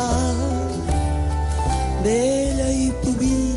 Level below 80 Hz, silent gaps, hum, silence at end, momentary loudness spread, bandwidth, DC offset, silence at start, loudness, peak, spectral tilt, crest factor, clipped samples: -24 dBFS; none; none; 0 s; 4 LU; 11.5 kHz; under 0.1%; 0 s; -21 LUFS; -8 dBFS; -6 dB/octave; 12 dB; under 0.1%